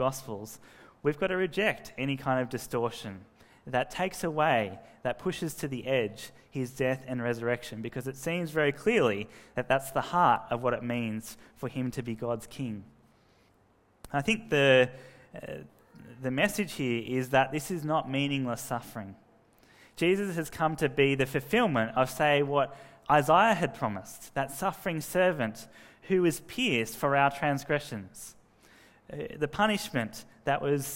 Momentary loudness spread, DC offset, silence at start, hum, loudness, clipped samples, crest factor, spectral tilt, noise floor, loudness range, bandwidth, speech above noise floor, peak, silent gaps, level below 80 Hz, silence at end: 15 LU; under 0.1%; 0 s; none; -29 LUFS; under 0.1%; 22 dB; -5 dB/octave; -65 dBFS; 5 LU; 16 kHz; 36 dB; -8 dBFS; none; -60 dBFS; 0 s